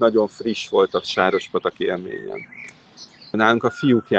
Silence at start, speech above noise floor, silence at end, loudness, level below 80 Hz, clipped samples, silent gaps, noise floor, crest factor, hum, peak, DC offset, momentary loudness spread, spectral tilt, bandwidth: 0 s; 25 dB; 0 s; -21 LUFS; -62 dBFS; under 0.1%; none; -45 dBFS; 20 dB; none; 0 dBFS; under 0.1%; 17 LU; -5.5 dB/octave; 8.4 kHz